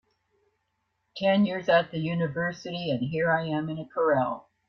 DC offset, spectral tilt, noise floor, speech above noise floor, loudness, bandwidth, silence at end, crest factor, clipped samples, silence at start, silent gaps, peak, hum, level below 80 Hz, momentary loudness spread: under 0.1%; -7 dB/octave; -77 dBFS; 51 dB; -27 LUFS; 6.6 kHz; 0.3 s; 18 dB; under 0.1%; 1.15 s; none; -10 dBFS; none; -66 dBFS; 8 LU